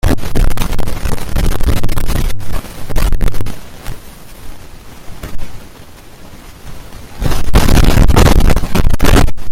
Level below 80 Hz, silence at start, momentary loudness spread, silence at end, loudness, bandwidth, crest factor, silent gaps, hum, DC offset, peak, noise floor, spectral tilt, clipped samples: -14 dBFS; 0.05 s; 25 LU; 0 s; -15 LUFS; 16 kHz; 10 dB; none; none; under 0.1%; 0 dBFS; -34 dBFS; -5.5 dB/octave; 0.5%